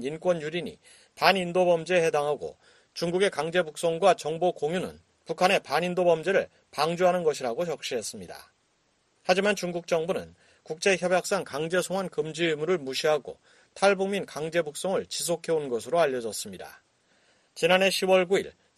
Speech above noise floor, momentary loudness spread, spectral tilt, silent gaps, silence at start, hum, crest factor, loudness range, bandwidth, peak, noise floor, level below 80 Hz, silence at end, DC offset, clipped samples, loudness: 43 dB; 13 LU; -4 dB/octave; none; 0 s; none; 24 dB; 3 LU; 13 kHz; -4 dBFS; -70 dBFS; -68 dBFS; 0.3 s; under 0.1%; under 0.1%; -26 LUFS